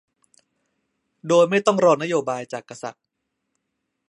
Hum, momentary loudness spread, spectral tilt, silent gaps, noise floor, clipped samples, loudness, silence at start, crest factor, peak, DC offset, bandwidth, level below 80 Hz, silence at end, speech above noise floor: none; 18 LU; -5 dB/octave; none; -78 dBFS; under 0.1%; -19 LUFS; 1.25 s; 20 dB; -4 dBFS; under 0.1%; 11 kHz; -76 dBFS; 1.15 s; 58 dB